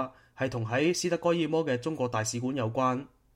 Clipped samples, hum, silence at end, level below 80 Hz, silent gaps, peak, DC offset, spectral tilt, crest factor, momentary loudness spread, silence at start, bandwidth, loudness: under 0.1%; none; 0.3 s; -64 dBFS; none; -14 dBFS; under 0.1%; -5 dB/octave; 16 dB; 7 LU; 0 s; 16 kHz; -29 LUFS